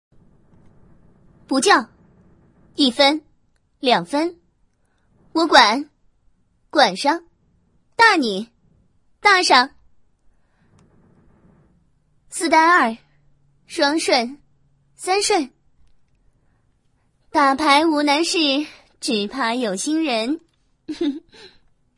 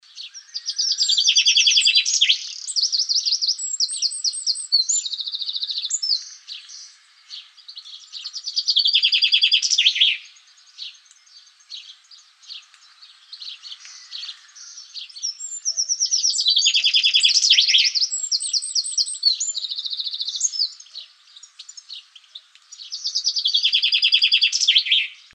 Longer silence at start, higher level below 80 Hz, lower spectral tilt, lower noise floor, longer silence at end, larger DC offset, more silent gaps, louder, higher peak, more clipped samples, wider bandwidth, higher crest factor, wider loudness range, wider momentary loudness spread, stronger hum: first, 1.5 s vs 0.15 s; first, -62 dBFS vs under -90 dBFS; first, -2 dB/octave vs 10.5 dB/octave; first, -63 dBFS vs -51 dBFS; first, 0.5 s vs 0.2 s; neither; neither; about the same, -18 LUFS vs -17 LUFS; about the same, 0 dBFS vs -2 dBFS; neither; first, 11.5 kHz vs 9.8 kHz; about the same, 22 dB vs 20 dB; second, 4 LU vs 17 LU; second, 17 LU vs 23 LU; neither